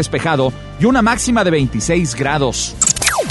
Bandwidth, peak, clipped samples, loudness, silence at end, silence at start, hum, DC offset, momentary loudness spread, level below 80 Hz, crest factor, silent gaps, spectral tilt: 12 kHz; 0 dBFS; under 0.1%; -15 LUFS; 0 s; 0 s; none; under 0.1%; 5 LU; -32 dBFS; 16 dB; none; -4 dB/octave